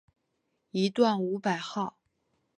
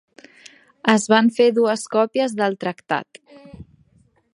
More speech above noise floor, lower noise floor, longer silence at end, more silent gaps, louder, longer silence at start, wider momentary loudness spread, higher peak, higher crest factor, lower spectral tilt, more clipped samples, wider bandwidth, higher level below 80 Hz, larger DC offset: first, 50 dB vs 40 dB; first, -78 dBFS vs -59 dBFS; about the same, 0.7 s vs 0.7 s; neither; second, -29 LUFS vs -19 LUFS; about the same, 0.75 s vs 0.85 s; about the same, 11 LU vs 11 LU; second, -10 dBFS vs 0 dBFS; about the same, 20 dB vs 22 dB; first, -6 dB/octave vs -4.5 dB/octave; neither; about the same, 10.5 kHz vs 11.5 kHz; second, -80 dBFS vs -60 dBFS; neither